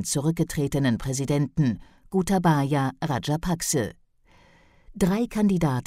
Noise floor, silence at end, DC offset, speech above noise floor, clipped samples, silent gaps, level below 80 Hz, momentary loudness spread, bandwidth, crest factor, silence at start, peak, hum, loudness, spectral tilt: -57 dBFS; 0.05 s; under 0.1%; 33 dB; under 0.1%; none; -46 dBFS; 5 LU; 16 kHz; 16 dB; 0 s; -10 dBFS; none; -25 LUFS; -5.5 dB/octave